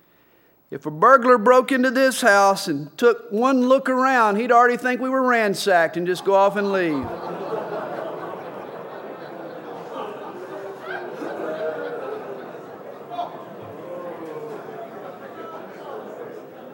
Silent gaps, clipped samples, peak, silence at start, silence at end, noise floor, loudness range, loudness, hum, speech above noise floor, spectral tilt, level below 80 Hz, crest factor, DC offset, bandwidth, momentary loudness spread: none; under 0.1%; 0 dBFS; 0.7 s; 0 s; -57 dBFS; 17 LU; -19 LUFS; none; 39 dB; -4.5 dB/octave; -68 dBFS; 22 dB; under 0.1%; 16.5 kHz; 20 LU